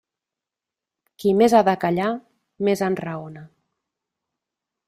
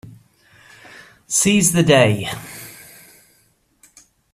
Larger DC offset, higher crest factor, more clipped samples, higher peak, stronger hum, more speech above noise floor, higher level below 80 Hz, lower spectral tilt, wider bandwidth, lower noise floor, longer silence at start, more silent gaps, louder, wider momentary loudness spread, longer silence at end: neither; about the same, 20 dB vs 20 dB; neither; second, -4 dBFS vs 0 dBFS; neither; first, 68 dB vs 45 dB; second, -64 dBFS vs -54 dBFS; first, -6.5 dB/octave vs -4 dB/octave; about the same, 15.5 kHz vs 15.5 kHz; first, -88 dBFS vs -60 dBFS; first, 1.2 s vs 0.05 s; neither; second, -20 LUFS vs -15 LUFS; second, 17 LU vs 23 LU; second, 1.4 s vs 1.6 s